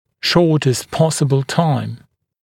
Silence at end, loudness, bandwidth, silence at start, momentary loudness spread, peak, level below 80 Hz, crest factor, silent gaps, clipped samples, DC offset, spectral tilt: 0.45 s; -16 LUFS; 16 kHz; 0.25 s; 9 LU; 0 dBFS; -52 dBFS; 16 dB; none; under 0.1%; under 0.1%; -5.5 dB/octave